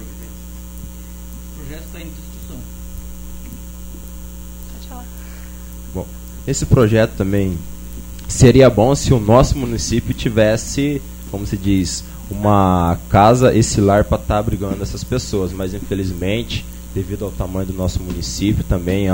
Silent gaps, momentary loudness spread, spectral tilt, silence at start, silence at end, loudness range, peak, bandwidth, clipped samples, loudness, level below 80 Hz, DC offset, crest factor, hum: none; 21 LU; -6 dB/octave; 0 s; 0 s; 19 LU; 0 dBFS; 16.5 kHz; under 0.1%; -16 LUFS; -28 dBFS; under 0.1%; 18 dB; 60 Hz at -30 dBFS